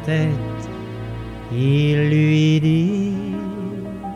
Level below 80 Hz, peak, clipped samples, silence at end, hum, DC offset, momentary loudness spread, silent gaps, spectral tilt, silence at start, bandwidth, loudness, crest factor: -42 dBFS; -8 dBFS; under 0.1%; 0 s; none; under 0.1%; 15 LU; none; -7.5 dB/octave; 0 s; 7.4 kHz; -19 LUFS; 12 dB